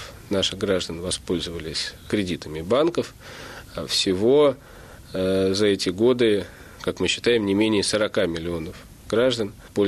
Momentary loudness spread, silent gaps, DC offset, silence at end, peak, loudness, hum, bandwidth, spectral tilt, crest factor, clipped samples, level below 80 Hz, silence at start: 15 LU; none; under 0.1%; 0 s; -8 dBFS; -23 LUFS; none; 14 kHz; -4.5 dB/octave; 14 dB; under 0.1%; -48 dBFS; 0 s